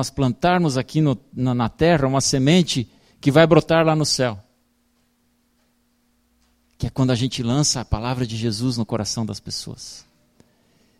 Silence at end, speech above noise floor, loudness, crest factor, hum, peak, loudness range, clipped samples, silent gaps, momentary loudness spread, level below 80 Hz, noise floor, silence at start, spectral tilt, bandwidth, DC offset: 1 s; 45 dB; -20 LUFS; 20 dB; none; -2 dBFS; 9 LU; under 0.1%; none; 13 LU; -42 dBFS; -64 dBFS; 0 s; -5 dB/octave; 15 kHz; under 0.1%